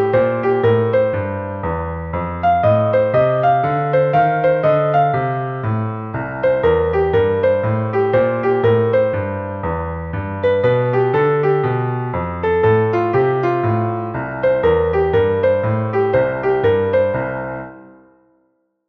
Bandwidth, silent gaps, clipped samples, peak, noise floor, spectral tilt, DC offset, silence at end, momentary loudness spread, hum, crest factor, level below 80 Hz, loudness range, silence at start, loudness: 5.4 kHz; none; under 0.1%; -2 dBFS; -64 dBFS; -10 dB/octave; under 0.1%; 1 s; 9 LU; none; 14 dB; -40 dBFS; 2 LU; 0 s; -17 LUFS